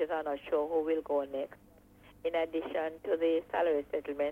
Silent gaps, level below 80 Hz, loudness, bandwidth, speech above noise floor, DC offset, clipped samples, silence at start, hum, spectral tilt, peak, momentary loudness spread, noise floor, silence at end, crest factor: none; -66 dBFS; -33 LUFS; 15 kHz; 26 dB; under 0.1%; under 0.1%; 0 s; 50 Hz at -70 dBFS; -6 dB/octave; -18 dBFS; 7 LU; -59 dBFS; 0 s; 14 dB